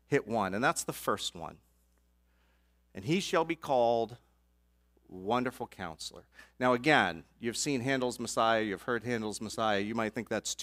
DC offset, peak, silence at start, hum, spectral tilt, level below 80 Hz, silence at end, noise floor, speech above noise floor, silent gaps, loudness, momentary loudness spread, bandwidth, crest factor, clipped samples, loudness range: under 0.1%; -10 dBFS; 0.1 s; 60 Hz at -65 dBFS; -4 dB/octave; -64 dBFS; 0 s; -70 dBFS; 38 dB; none; -32 LUFS; 13 LU; 16 kHz; 24 dB; under 0.1%; 4 LU